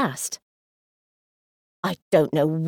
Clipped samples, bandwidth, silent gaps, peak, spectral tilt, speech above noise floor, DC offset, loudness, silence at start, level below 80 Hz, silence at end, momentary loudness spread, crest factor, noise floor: under 0.1%; 19 kHz; 0.42-1.83 s, 2.02-2.11 s; -6 dBFS; -5.5 dB/octave; over 67 dB; under 0.1%; -24 LUFS; 0 s; -70 dBFS; 0 s; 11 LU; 20 dB; under -90 dBFS